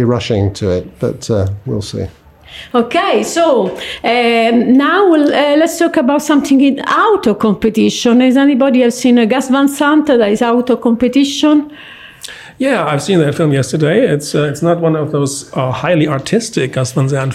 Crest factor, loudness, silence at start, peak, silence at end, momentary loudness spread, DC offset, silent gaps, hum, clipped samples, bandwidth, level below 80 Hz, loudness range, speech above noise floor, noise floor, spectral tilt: 10 dB; -12 LUFS; 0 s; -2 dBFS; 0 s; 9 LU; under 0.1%; none; none; under 0.1%; 15 kHz; -46 dBFS; 4 LU; 21 dB; -32 dBFS; -5.5 dB/octave